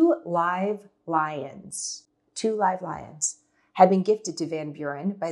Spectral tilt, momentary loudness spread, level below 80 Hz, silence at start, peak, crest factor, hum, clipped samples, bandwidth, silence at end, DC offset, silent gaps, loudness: -5 dB/octave; 16 LU; -70 dBFS; 0 s; -2 dBFS; 22 dB; none; under 0.1%; 12 kHz; 0 s; under 0.1%; none; -26 LUFS